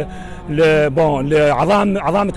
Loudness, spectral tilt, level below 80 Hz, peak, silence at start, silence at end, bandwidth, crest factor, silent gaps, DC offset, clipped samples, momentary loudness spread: -15 LUFS; -7 dB/octave; -36 dBFS; -6 dBFS; 0 s; 0 s; 12 kHz; 8 dB; none; under 0.1%; under 0.1%; 11 LU